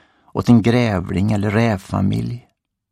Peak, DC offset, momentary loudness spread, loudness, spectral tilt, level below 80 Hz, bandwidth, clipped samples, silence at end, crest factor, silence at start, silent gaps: -2 dBFS; under 0.1%; 13 LU; -18 LUFS; -7.5 dB/octave; -44 dBFS; 13 kHz; under 0.1%; 0.5 s; 16 dB; 0.35 s; none